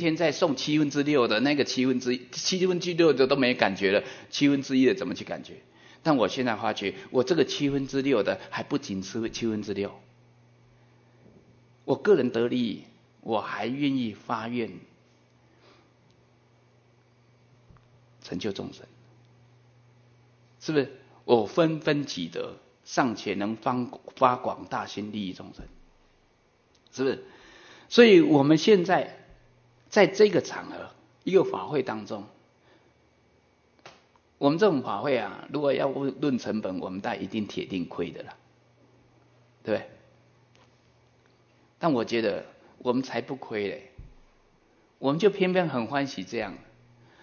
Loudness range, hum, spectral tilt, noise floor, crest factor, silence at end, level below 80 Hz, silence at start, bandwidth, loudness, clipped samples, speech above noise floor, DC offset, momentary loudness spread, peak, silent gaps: 14 LU; none; -5.5 dB/octave; -64 dBFS; 24 dB; 0.65 s; -64 dBFS; 0 s; 7 kHz; -26 LUFS; under 0.1%; 39 dB; under 0.1%; 15 LU; -4 dBFS; none